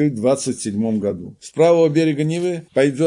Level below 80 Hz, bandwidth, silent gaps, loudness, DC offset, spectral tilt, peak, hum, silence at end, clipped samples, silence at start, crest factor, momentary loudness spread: -62 dBFS; 11.5 kHz; none; -18 LUFS; under 0.1%; -6 dB/octave; -4 dBFS; none; 0 s; under 0.1%; 0 s; 14 dB; 10 LU